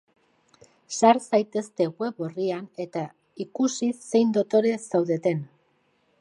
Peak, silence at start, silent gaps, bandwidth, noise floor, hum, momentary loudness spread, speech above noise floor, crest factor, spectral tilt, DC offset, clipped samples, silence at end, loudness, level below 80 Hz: -4 dBFS; 0.9 s; none; 11.5 kHz; -67 dBFS; none; 13 LU; 43 dB; 22 dB; -5.5 dB/octave; under 0.1%; under 0.1%; 0.75 s; -25 LUFS; -78 dBFS